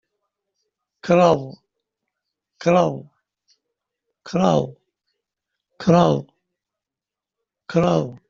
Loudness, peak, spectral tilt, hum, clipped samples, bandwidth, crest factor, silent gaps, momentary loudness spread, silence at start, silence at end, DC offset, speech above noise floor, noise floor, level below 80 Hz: -19 LUFS; -2 dBFS; -7 dB/octave; none; under 0.1%; 7.4 kHz; 20 dB; none; 15 LU; 1.05 s; 0.15 s; under 0.1%; 70 dB; -88 dBFS; -58 dBFS